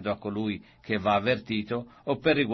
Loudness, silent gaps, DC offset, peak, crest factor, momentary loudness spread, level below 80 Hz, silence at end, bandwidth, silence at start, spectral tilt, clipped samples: -29 LUFS; none; under 0.1%; -10 dBFS; 18 dB; 9 LU; -60 dBFS; 0 s; 6.2 kHz; 0 s; -7.5 dB/octave; under 0.1%